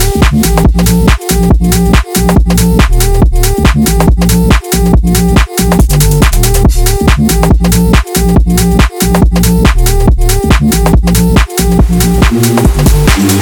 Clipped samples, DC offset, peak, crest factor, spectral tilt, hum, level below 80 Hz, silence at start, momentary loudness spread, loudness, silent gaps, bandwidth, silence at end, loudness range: 0.3%; under 0.1%; 0 dBFS; 6 dB; -5.5 dB/octave; none; -10 dBFS; 0 s; 2 LU; -8 LUFS; none; 20 kHz; 0 s; 0 LU